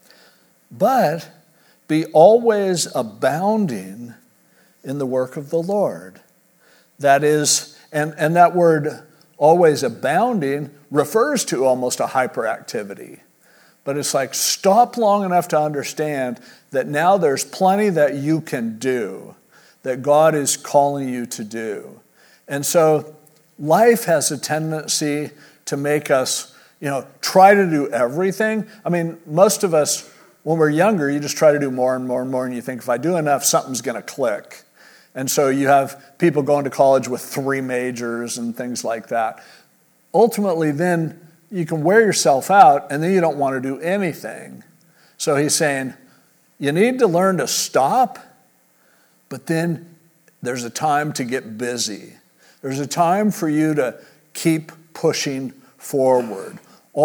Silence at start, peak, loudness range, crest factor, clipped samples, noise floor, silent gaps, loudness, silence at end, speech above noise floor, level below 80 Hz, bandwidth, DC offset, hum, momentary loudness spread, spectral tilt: 0.7 s; 0 dBFS; 6 LU; 20 dB; under 0.1%; -57 dBFS; none; -18 LUFS; 0 s; 39 dB; -76 dBFS; over 20 kHz; under 0.1%; none; 14 LU; -4.5 dB/octave